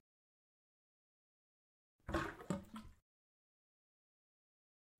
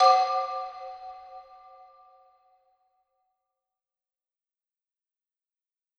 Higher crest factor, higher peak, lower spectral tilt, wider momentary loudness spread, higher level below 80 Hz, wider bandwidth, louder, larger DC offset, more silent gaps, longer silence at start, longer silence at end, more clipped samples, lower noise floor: about the same, 26 dB vs 24 dB; second, -26 dBFS vs -8 dBFS; first, -6 dB/octave vs 1 dB/octave; second, 15 LU vs 27 LU; first, -64 dBFS vs -78 dBFS; first, 16 kHz vs 8.8 kHz; second, -45 LUFS vs -27 LUFS; neither; neither; first, 2.05 s vs 0 s; second, 2.1 s vs 4.55 s; neither; about the same, under -90 dBFS vs -90 dBFS